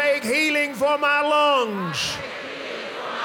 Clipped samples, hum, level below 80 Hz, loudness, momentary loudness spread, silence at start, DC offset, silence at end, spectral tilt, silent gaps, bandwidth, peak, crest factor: under 0.1%; none; -60 dBFS; -21 LUFS; 13 LU; 0 s; under 0.1%; 0 s; -3 dB/octave; none; 18 kHz; -8 dBFS; 14 dB